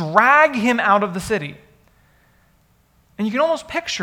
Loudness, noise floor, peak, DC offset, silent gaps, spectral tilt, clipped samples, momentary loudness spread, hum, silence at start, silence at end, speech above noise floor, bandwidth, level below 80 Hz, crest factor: -17 LUFS; -58 dBFS; 0 dBFS; under 0.1%; none; -4.5 dB/octave; under 0.1%; 12 LU; none; 0 s; 0 s; 41 dB; 17 kHz; -54 dBFS; 20 dB